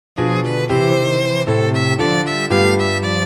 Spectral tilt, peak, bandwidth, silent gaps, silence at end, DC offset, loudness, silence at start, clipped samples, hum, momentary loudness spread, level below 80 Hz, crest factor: -5.5 dB/octave; -2 dBFS; 19 kHz; none; 0 s; 0.2%; -16 LUFS; 0.15 s; under 0.1%; none; 3 LU; -48 dBFS; 14 dB